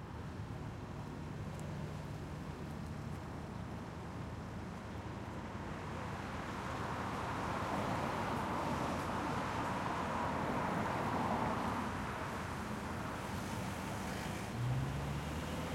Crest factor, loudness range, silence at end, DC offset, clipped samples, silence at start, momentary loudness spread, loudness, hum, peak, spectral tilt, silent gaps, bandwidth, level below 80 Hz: 16 dB; 8 LU; 0 s; under 0.1%; under 0.1%; 0 s; 9 LU; -41 LUFS; none; -24 dBFS; -6 dB/octave; none; 16.5 kHz; -56 dBFS